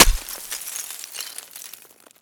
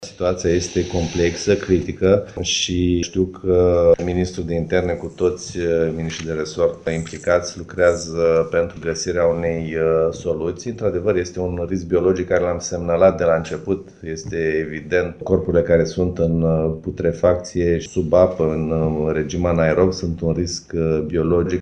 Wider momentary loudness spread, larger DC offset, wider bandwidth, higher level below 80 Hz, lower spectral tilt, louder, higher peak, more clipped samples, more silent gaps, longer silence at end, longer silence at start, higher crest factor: first, 11 LU vs 8 LU; neither; first, over 20 kHz vs 9.2 kHz; first, -30 dBFS vs -40 dBFS; second, -1 dB/octave vs -5.5 dB/octave; second, -25 LUFS vs -20 LUFS; about the same, 0 dBFS vs 0 dBFS; neither; neither; first, 0.5 s vs 0 s; about the same, 0 s vs 0 s; first, 24 dB vs 18 dB